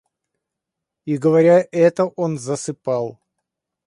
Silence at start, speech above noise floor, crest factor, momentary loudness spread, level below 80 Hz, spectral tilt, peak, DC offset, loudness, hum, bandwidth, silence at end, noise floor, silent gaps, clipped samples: 1.05 s; 66 dB; 18 dB; 12 LU; -68 dBFS; -6.5 dB/octave; -2 dBFS; under 0.1%; -18 LUFS; none; 11 kHz; 0.75 s; -83 dBFS; none; under 0.1%